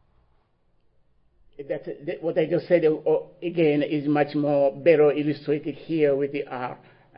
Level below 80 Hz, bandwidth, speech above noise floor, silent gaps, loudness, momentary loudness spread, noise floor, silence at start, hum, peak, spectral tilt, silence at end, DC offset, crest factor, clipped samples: -66 dBFS; 5.4 kHz; 41 dB; none; -24 LUFS; 13 LU; -64 dBFS; 1.6 s; none; -6 dBFS; -11.5 dB/octave; 0.4 s; under 0.1%; 18 dB; under 0.1%